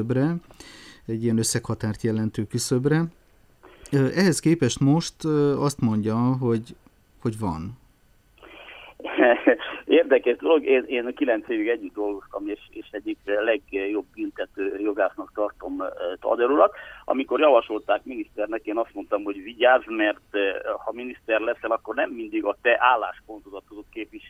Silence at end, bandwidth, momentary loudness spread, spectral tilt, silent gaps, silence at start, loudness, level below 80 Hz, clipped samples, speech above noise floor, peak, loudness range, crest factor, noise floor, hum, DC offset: 0 s; 15 kHz; 15 LU; -5.5 dB/octave; none; 0 s; -24 LUFS; -56 dBFS; under 0.1%; 35 dB; -4 dBFS; 5 LU; 20 dB; -59 dBFS; none; under 0.1%